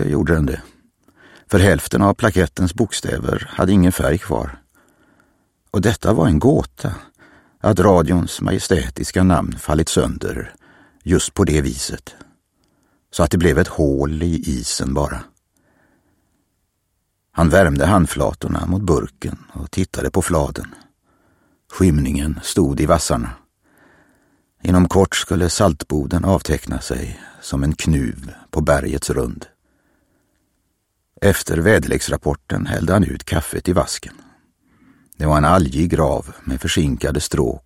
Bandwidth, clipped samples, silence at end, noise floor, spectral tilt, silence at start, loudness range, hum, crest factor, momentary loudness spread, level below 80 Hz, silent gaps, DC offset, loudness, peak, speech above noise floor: 16.5 kHz; under 0.1%; 0.1 s; -70 dBFS; -5.5 dB/octave; 0 s; 5 LU; none; 18 dB; 13 LU; -32 dBFS; none; under 0.1%; -18 LUFS; 0 dBFS; 53 dB